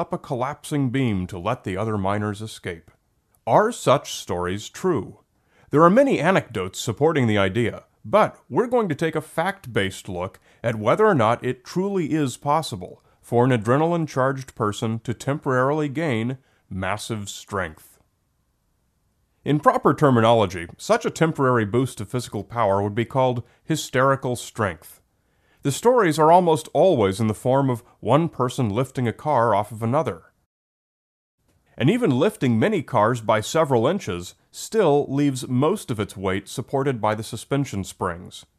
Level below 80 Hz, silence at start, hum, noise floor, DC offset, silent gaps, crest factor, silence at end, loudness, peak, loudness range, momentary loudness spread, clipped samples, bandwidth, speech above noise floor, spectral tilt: -58 dBFS; 0 s; none; -69 dBFS; under 0.1%; 30.46-31.38 s; 22 dB; 0.2 s; -22 LUFS; 0 dBFS; 5 LU; 12 LU; under 0.1%; 14 kHz; 47 dB; -6 dB/octave